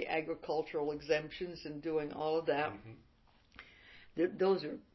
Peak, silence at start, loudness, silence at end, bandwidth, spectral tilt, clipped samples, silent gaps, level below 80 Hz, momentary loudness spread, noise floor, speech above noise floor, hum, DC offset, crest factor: -18 dBFS; 0 s; -36 LUFS; 0.15 s; 6 kHz; -4 dB/octave; under 0.1%; none; -68 dBFS; 23 LU; -65 dBFS; 29 dB; none; under 0.1%; 18 dB